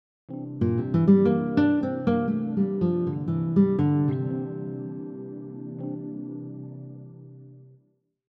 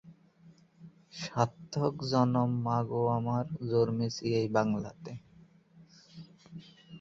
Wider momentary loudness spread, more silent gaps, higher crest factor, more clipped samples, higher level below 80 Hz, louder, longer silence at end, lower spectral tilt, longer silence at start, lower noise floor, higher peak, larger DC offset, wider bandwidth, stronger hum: second, 19 LU vs 22 LU; neither; about the same, 18 dB vs 20 dB; neither; about the same, -62 dBFS vs -66 dBFS; first, -25 LUFS vs -31 LUFS; first, 0.65 s vs 0 s; first, -11.5 dB/octave vs -7 dB/octave; first, 0.3 s vs 0.05 s; first, -67 dBFS vs -60 dBFS; first, -8 dBFS vs -12 dBFS; neither; second, 5.4 kHz vs 7.6 kHz; neither